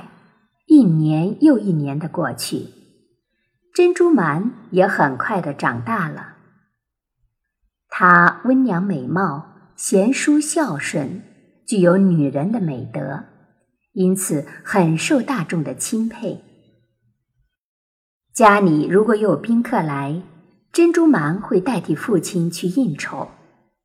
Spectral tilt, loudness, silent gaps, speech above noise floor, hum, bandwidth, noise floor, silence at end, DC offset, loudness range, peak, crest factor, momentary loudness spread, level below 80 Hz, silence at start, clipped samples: -6 dB/octave; -18 LUFS; 17.58-18.21 s; 60 dB; none; 15 kHz; -77 dBFS; 0.55 s; under 0.1%; 5 LU; 0 dBFS; 18 dB; 14 LU; -64 dBFS; 0 s; under 0.1%